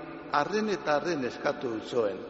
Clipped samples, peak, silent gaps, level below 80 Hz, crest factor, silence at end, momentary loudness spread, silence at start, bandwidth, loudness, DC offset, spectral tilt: under 0.1%; -10 dBFS; none; -66 dBFS; 20 dB; 0 s; 4 LU; 0 s; 8 kHz; -30 LUFS; under 0.1%; -3.5 dB/octave